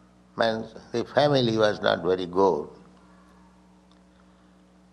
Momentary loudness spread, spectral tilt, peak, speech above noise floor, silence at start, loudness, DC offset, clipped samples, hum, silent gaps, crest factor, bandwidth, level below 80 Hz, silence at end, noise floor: 12 LU; -6 dB/octave; -6 dBFS; 32 dB; 0.35 s; -24 LUFS; under 0.1%; under 0.1%; none; none; 20 dB; 10 kHz; -62 dBFS; 2.25 s; -56 dBFS